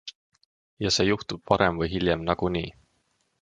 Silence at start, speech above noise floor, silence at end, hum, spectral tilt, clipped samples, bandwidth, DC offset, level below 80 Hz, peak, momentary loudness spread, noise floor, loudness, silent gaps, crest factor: 0.05 s; 46 dB; 0.7 s; none; -4.5 dB/octave; under 0.1%; 10.5 kHz; under 0.1%; -46 dBFS; -4 dBFS; 9 LU; -71 dBFS; -25 LUFS; 0.15-0.32 s, 0.46-0.77 s; 24 dB